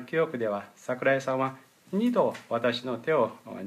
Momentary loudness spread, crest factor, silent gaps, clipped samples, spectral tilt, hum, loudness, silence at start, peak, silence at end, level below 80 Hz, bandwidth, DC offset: 7 LU; 18 dB; none; under 0.1%; -6 dB/octave; none; -28 LUFS; 0 s; -12 dBFS; 0 s; -80 dBFS; 15 kHz; under 0.1%